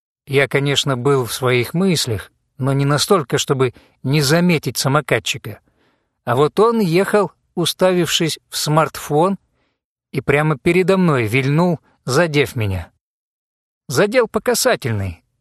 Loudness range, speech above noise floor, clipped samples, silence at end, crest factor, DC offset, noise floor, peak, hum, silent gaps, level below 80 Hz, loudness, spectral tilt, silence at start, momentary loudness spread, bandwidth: 2 LU; 55 dB; under 0.1%; 0.25 s; 18 dB; under 0.1%; -72 dBFS; 0 dBFS; none; 9.84-9.96 s, 13.01-13.81 s; -50 dBFS; -17 LUFS; -5 dB/octave; 0.3 s; 9 LU; 13 kHz